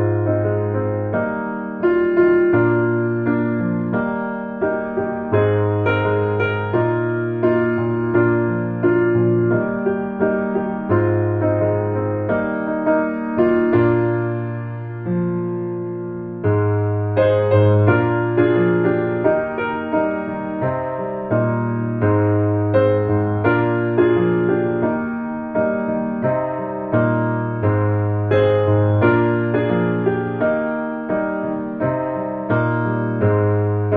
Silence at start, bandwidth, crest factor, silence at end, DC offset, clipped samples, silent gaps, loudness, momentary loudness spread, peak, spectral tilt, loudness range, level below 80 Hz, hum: 0 s; 4 kHz; 16 dB; 0 s; under 0.1%; under 0.1%; none; -19 LUFS; 8 LU; -2 dBFS; -8 dB/octave; 3 LU; -50 dBFS; none